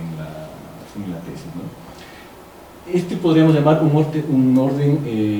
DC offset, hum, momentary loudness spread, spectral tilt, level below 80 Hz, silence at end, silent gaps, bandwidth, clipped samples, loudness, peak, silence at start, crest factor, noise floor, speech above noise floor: under 0.1%; none; 24 LU; -8.5 dB/octave; -52 dBFS; 0 s; none; 19.5 kHz; under 0.1%; -17 LUFS; -2 dBFS; 0 s; 18 dB; -41 dBFS; 24 dB